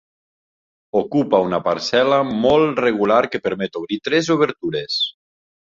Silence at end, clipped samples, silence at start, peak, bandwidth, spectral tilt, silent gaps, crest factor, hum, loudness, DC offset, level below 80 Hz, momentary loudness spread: 0.65 s; under 0.1%; 0.95 s; -2 dBFS; 7.6 kHz; -5 dB/octave; none; 18 dB; none; -18 LUFS; under 0.1%; -54 dBFS; 8 LU